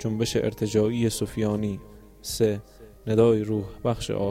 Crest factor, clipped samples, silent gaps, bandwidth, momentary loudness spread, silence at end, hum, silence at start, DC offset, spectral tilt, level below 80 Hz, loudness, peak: 16 dB; under 0.1%; none; 16.5 kHz; 13 LU; 0 s; none; 0 s; under 0.1%; -6 dB/octave; -48 dBFS; -25 LUFS; -8 dBFS